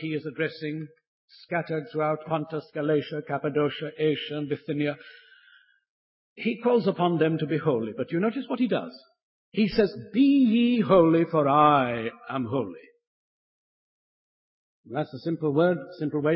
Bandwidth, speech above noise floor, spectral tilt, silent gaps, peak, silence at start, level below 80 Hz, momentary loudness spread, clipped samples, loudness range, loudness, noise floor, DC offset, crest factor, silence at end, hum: 5.8 kHz; 34 dB; -11 dB/octave; 1.07-1.28 s, 5.90-6.36 s, 9.23-9.52 s, 13.07-14.84 s; -6 dBFS; 0 s; -64 dBFS; 13 LU; under 0.1%; 9 LU; -26 LUFS; -59 dBFS; under 0.1%; 20 dB; 0 s; none